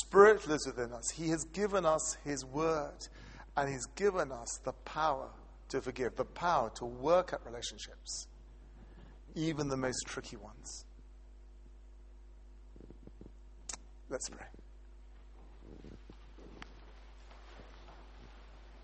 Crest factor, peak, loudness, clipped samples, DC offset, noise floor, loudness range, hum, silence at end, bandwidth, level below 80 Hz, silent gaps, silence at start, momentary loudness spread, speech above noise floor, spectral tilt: 28 dB; -8 dBFS; -35 LUFS; under 0.1%; under 0.1%; -54 dBFS; 19 LU; none; 0 s; 8.4 kHz; -54 dBFS; none; 0 s; 25 LU; 20 dB; -4 dB/octave